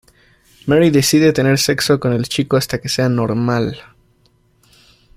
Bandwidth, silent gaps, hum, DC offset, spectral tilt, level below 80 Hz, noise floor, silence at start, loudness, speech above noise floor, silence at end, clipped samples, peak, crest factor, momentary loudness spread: 16 kHz; none; none; under 0.1%; -5 dB/octave; -48 dBFS; -56 dBFS; 0.65 s; -15 LUFS; 42 dB; 1.35 s; under 0.1%; -2 dBFS; 16 dB; 8 LU